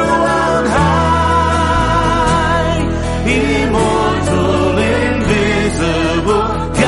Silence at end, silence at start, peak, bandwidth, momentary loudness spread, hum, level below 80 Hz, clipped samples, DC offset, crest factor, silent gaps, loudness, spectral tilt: 0 s; 0 s; -2 dBFS; 11.5 kHz; 3 LU; none; -24 dBFS; under 0.1%; under 0.1%; 10 dB; none; -13 LUFS; -5.5 dB/octave